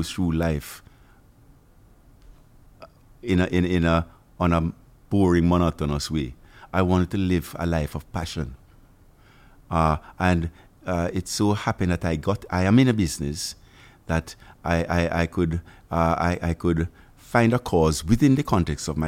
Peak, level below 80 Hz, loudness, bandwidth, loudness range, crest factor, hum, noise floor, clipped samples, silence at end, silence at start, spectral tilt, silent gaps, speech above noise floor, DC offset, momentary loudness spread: -4 dBFS; -38 dBFS; -24 LUFS; 16 kHz; 5 LU; 20 dB; none; -54 dBFS; under 0.1%; 0 s; 0 s; -6.5 dB/octave; none; 31 dB; under 0.1%; 12 LU